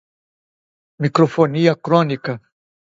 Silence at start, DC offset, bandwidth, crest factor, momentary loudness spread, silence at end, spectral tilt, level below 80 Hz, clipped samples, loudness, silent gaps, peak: 1 s; under 0.1%; 7.8 kHz; 18 dB; 11 LU; 0.6 s; -7.5 dB/octave; -64 dBFS; under 0.1%; -17 LUFS; none; 0 dBFS